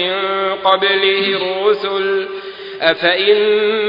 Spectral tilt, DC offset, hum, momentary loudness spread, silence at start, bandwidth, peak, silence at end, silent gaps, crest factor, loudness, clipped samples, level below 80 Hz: -6 dB/octave; under 0.1%; none; 7 LU; 0 s; 5.4 kHz; 0 dBFS; 0 s; none; 16 dB; -14 LUFS; under 0.1%; -60 dBFS